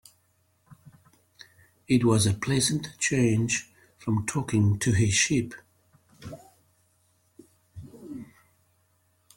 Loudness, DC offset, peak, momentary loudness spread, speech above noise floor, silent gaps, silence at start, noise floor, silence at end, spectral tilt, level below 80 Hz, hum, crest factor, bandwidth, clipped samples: -25 LUFS; under 0.1%; -8 dBFS; 23 LU; 44 dB; none; 0.7 s; -68 dBFS; 1.15 s; -4.5 dB/octave; -56 dBFS; none; 20 dB; 16.5 kHz; under 0.1%